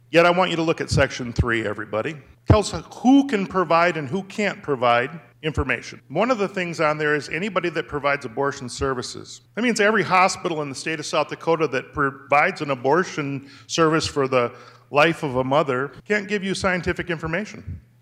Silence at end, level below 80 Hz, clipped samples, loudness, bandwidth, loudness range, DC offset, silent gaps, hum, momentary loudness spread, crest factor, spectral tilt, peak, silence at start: 0.25 s; -44 dBFS; under 0.1%; -22 LUFS; 13.5 kHz; 3 LU; under 0.1%; none; none; 10 LU; 18 dB; -5 dB/octave; -4 dBFS; 0.1 s